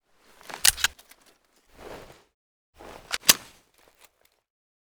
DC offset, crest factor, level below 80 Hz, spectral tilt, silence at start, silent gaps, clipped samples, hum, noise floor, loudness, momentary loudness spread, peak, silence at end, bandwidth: under 0.1%; 32 dB; -54 dBFS; 1 dB/octave; 0.55 s; 2.34-2.73 s; under 0.1%; none; -62 dBFS; -22 LUFS; 26 LU; 0 dBFS; 1.6 s; over 20 kHz